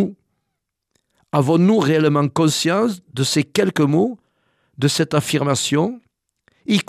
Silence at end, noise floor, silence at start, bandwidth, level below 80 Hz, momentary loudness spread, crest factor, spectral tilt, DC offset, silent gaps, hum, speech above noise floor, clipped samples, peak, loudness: 0.05 s; -77 dBFS; 0 s; 14.5 kHz; -62 dBFS; 8 LU; 16 dB; -5 dB/octave; under 0.1%; none; none; 60 dB; under 0.1%; -2 dBFS; -18 LUFS